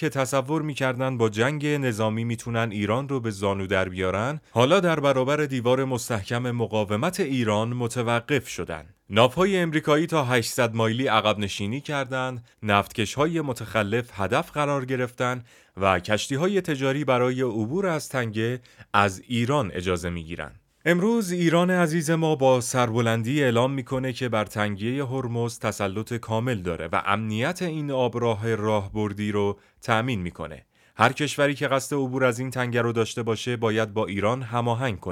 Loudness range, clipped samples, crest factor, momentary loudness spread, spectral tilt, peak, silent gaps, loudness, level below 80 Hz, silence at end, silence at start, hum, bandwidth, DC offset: 3 LU; under 0.1%; 22 dB; 7 LU; -5.5 dB/octave; -2 dBFS; none; -25 LUFS; -58 dBFS; 0 s; 0 s; none; 16.5 kHz; under 0.1%